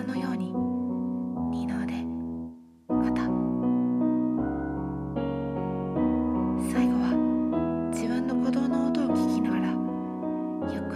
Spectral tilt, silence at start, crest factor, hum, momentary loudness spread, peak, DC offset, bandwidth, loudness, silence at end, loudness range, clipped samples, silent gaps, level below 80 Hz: -7.5 dB/octave; 0 s; 14 dB; none; 7 LU; -14 dBFS; under 0.1%; 12.5 kHz; -28 LUFS; 0 s; 3 LU; under 0.1%; none; -48 dBFS